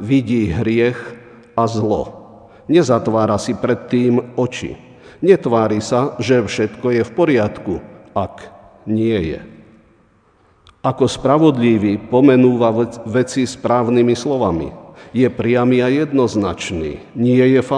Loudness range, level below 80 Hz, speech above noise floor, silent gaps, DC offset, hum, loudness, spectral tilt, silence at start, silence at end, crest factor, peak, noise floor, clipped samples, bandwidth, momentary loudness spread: 5 LU; -46 dBFS; 39 dB; none; under 0.1%; none; -16 LUFS; -6.5 dB/octave; 0 s; 0 s; 16 dB; 0 dBFS; -54 dBFS; under 0.1%; 10 kHz; 12 LU